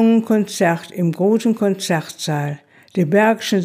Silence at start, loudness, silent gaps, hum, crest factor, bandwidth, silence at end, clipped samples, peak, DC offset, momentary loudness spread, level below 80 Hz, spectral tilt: 0 s; -18 LUFS; none; none; 14 dB; 16 kHz; 0 s; under 0.1%; -2 dBFS; under 0.1%; 8 LU; -72 dBFS; -6 dB/octave